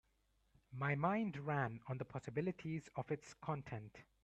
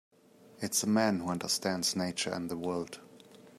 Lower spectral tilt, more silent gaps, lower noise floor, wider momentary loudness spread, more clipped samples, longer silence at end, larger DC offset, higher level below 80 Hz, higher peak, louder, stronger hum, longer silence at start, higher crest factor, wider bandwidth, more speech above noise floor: first, -7.5 dB/octave vs -3.5 dB/octave; neither; first, -79 dBFS vs -55 dBFS; about the same, 11 LU vs 11 LU; neither; first, 0.2 s vs 0.05 s; neither; about the same, -74 dBFS vs -72 dBFS; second, -24 dBFS vs -14 dBFS; second, -43 LUFS vs -32 LUFS; neither; first, 0.7 s vs 0.55 s; about the same, 20 dB vs 20 dB; second, 8.6 kHz vs 15.5 kHz; first, 36 dB vs 23 dB